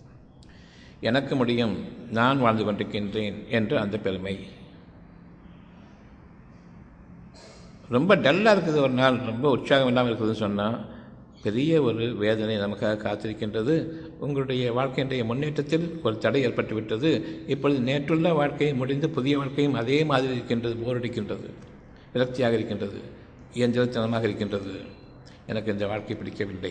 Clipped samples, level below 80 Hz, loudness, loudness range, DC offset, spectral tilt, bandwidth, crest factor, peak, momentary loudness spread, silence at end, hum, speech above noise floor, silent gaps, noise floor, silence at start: under 0.1%; -56 dBFS; -25 LUFS; 7 LU; under 0.1%; -7 dB/octave; 9.6 kHz; 22 dB; -4 dBFS; 12 LU; 0 s; none; 25 dB; none; -49 dBFS; 0.05 s